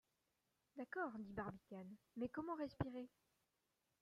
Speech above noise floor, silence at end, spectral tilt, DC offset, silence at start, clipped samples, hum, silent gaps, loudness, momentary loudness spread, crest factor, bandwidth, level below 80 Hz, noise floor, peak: 38 dB; 0.95 s; -8.5 dB/octave; under 0.1%; 0.75 s; under 0.1%; none; none; -50 LUFS; 10 LU; 24 dB; 14.5 kHz; -72 dBFS; -88 dBFS; -28 dBFS